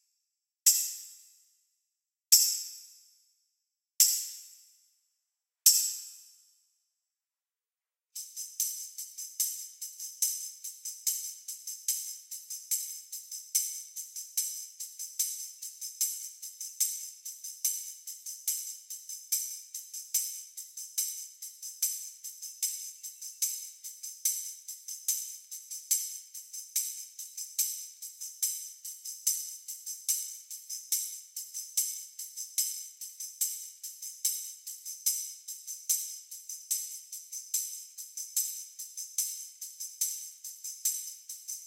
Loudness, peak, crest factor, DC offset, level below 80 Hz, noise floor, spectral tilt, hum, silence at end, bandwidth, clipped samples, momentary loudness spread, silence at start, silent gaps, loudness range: -32 LUFS; -4 dBFS; 32 dB; under 0.1%; under -90 dBFS; under -90 dBFS; 11 dB/octave; none; 0 s; 17 kHz; under 0.1%; 12 LU; 0.65 s; none; 7 LU